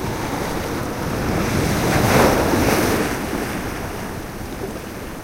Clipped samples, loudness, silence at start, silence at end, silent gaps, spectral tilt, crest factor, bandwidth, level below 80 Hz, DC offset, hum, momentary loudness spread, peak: under 0.1%; -21 LUFS; 0 s; 0 s; none; -5 dB/octave; 18 dB; 16 kHz; -34 dBFS; under 0.1%; none; 14 LU; -2 dBFS